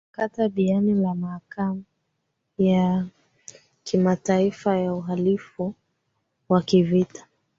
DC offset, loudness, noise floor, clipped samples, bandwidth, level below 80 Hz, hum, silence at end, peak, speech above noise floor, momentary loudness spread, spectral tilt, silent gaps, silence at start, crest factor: under 0.1%; -23 LUFS; -76 dBFS; under 0.1%; 7.6 kHz; -62 dBFS; none; 0.4 s; -6 dBFS; 54 dB; 12 LU; -7.5 dB/octave; none; 0.2 s; 18 dB